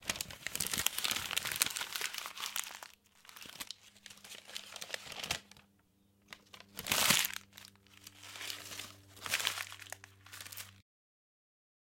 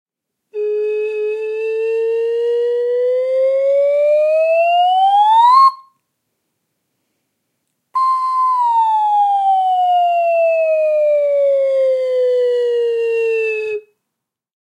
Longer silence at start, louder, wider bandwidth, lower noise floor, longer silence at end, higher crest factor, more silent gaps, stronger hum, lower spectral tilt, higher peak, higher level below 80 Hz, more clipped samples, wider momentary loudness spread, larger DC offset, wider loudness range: second, 0 s vs 0.55 s; second, -36 LUFS vs -15 LUFS; first, 17 kHz vs 11.5 kHz; second, -71 dBFS vs -79 dBFS; first, 1.2 s vs 0.8 s; first, 34 dB vs 14 dB; neither; neither; about the same, 0 dB/octave vs -1 dB/octave; second, -6 dBFS vs -2 dBFS; first, -70 dBFS vs under -90 dBFS; neither; first, 21 LU vs 8 LU; neither; first, 10 LU vs 5 LU